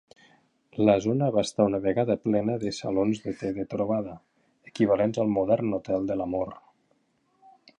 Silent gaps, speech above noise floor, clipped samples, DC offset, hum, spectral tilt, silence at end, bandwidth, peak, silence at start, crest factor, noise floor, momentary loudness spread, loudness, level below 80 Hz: none; 44 dB; under 0.1%; under 0.1%; none; -7 dB/octave; 1.2 s; 11 kHz; -6 dBFS; 0.75 s; 20 dB; -70 dBFS; 9 LU; -26 LUFS; -58 dBFS